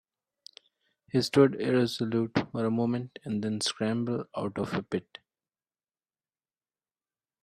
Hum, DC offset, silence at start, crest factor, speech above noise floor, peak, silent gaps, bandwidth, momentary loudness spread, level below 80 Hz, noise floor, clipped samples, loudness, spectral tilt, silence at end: none; under 0.1%; 1.15 s; 22 dB; over 62 dB; -10 dBFS; none; 13.5 kHz; 11 LU; -70 dBFS; under -90 dBFS; under 0.1%; -29 LUFS; -5.5 dB/octave; 2.4 s